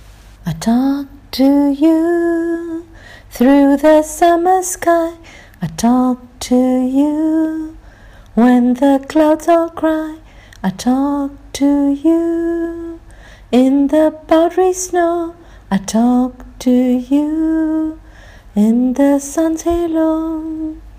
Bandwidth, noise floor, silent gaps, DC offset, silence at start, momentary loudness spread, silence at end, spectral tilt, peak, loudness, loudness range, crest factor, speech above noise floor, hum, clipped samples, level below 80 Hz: 16 kHz; -39 dBFS; none; under 0.1%; 0.1 s; 12 LU; 0 s; -5.5 dB/octave; -2 dBFS; -14 LUFS; 3 LU; 12 dB; 26 dB; none; under 0.1%; -40 dBFS